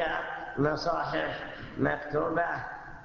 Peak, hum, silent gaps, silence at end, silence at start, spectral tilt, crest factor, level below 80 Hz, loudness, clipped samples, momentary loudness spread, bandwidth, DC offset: -14 dBFS; none; none; 0 s; 0 s; -6.5 dB/octave; 18 dB; -54 dBFS; -31 LUFS; under 0.1%; 9 LU; 7.2 kHz; under 0.1%